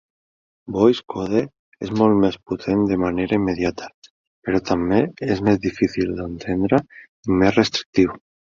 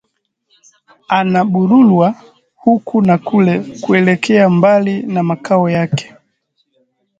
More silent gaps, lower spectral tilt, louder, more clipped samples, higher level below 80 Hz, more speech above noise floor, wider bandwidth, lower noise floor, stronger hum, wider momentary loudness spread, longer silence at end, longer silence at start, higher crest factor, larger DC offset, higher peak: first, 1.59-1.72 s, 3.94-4.02 s, 4.10-4.42 s, 7.09-7.23 s, 7.86-7.93 s vs none; about the same, -6.5 dB/octave vs -7.5 dB/octave; second, -20 LUFS vs -13 LUFS; neither; first, -46 dBFS vs -58 dBFS; first, over 70 dB vs 55 dB; about the same, 7.4 kHz vs 7.8 kHz; first, under -90 dBFS vs -66 dBFS; neither; first, 12 LU vs 8 LU; second, 0.4 s vs 1.15 s; second, 0.65 s vs 1.1 s; about the same, 18 dB vs 14 dB; neither; about the same, -2 dBFS vs 0 dBFS